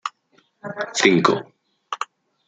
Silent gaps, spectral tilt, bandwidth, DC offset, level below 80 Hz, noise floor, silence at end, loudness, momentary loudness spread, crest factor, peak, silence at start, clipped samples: none; -4 dB/octave; 9.4 kHz; under 0.1%; -70 dBFS; -62 dBFS; 0.45 s; -20 LUFS; 19 LU; 22 dB; -2 dBFS; 0.05 s; under 0.1%